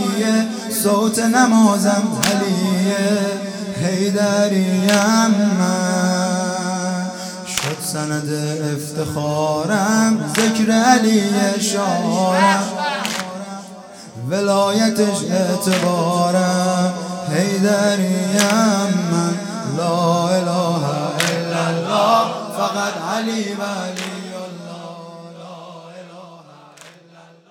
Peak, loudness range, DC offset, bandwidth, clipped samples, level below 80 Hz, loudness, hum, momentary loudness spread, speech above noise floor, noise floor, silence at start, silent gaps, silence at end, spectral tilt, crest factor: 0 dBFS; 6 LU; under 0.1%; 17.5 kHz; under 0.1%; -62 dBFS; -18 LUFS; none; 15 LU; 29 dB; -46 dBFS; 0 s; none; 0.3 s; -4.5 dB/octave; 18 dB